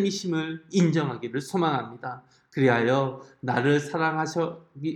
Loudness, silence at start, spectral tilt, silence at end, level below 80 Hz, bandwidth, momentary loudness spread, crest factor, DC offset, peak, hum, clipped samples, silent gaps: -26 LUFS; 0 s; -6 dB/octave; 0 s; -72 dBFS; 13 kHz; 13 LU; 18 dB; under 0.1%; -8 dBFS; none; under 0.1%; none